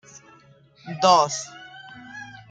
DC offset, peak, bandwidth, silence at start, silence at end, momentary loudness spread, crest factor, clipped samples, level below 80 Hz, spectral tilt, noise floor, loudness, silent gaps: under 0.1%; -4 dBFS; 9.4 kHz; 0.85 s; 0.2 s; 24 LU; 22 dB; under 0.1%; -70 dBFS; -3 dB/octave; -54 dBFS; -20 LUFS; none